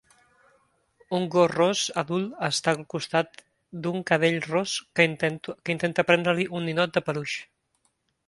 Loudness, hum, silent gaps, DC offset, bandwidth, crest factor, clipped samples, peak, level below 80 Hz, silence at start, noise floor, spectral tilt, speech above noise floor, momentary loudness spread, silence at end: -25 LUFS; none; none; under 0.1%; 11.5 kHz; 22 dB; under 0.1%; -4 dBFS; -68 dBFS; 1.1 s; -72 dBFS; -4.5 dB/octave; 47 dB; 9 LU; 0.85 s